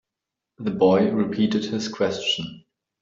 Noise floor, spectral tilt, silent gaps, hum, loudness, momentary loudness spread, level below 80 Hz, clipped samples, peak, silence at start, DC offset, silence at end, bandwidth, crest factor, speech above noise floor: -85 dBFS; -5.5 dB/octave; none; none; -22 LUFS; 11 LU; -64 dBFS; under 0.1%; -6 dBFS; 0.6 s; under 0.1%; 0.45 s; 7.6 kHz; 18 dB; 64 dB